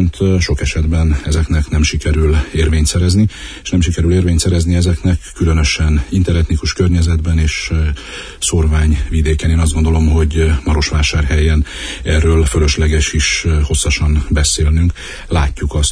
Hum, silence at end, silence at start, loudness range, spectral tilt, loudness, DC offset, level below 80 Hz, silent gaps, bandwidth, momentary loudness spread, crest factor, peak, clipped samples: none; 0 s; 0 s; 1 LU; -5 dB/octave; -14 LUFS; under 0.1%; -16 dBFS; none; 10.5 kHz; 4 LU; 10 dB; -2 dBFS; under 0.1%